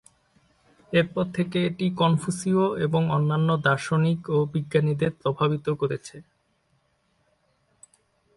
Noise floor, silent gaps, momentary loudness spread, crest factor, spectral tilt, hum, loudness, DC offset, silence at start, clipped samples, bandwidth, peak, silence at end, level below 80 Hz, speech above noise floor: -69 dBFS; none; 4 LU; 18 dB; -6.5 dB/octave; none; -24 LUFS; under 0.1%; 0.9 s; under 0.1%; 11.5 kHz; -8 dBFS; 2.15 s; -60 dBFS; 45 dB